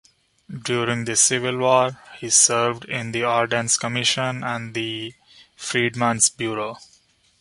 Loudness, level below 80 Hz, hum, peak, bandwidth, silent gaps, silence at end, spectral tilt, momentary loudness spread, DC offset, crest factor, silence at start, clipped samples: -20 LUFS; -62 dBFS; none; 0 dBFS; 11.5 kHz; none; 0.55 s; -2.5 dB/octave; 14 LU; under 0.1%; 22 dB; 0.5 s; under 0.1%